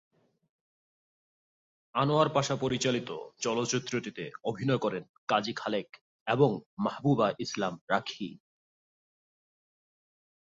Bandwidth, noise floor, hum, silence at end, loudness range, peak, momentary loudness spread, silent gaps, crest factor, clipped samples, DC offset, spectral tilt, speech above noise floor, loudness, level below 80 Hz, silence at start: 8 kHz; under -90 dBFS; none; 2.2 s; 3 LU; -10 dBFS; 12 LU; 5.09-5.27 s, 6.01-6.26 s, 6.66-6.77 s, 7.81-7.88 s; 22 dB; under 0.1%; under 0.1%; -5 dB/octave; over 60 dB; -30 LUFS; -70 dBFS; 1.95 s